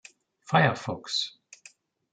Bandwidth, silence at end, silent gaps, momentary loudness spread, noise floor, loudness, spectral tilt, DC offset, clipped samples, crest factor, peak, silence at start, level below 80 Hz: 9.4 kHz; 0.85 s; none; 11 LU; -57 dBFS; -27 LUFS; -4.5 dB/octave; under 0.1%; under 0.1%; 22 dB; -8 dBFS; 0.5 s; -70 dBFS